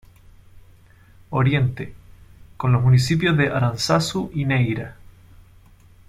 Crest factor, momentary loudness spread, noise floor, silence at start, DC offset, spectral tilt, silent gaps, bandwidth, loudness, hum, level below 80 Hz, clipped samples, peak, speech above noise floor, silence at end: 16 dB; 12 LU; -50 dBFS; 0.55 s; under 0.1%; -6 dB/octave; none; 14 kHz; -20 LUFS; none; -46 dBFS; under 0.1%; -6 dBFS; 30 dB; 1.15 s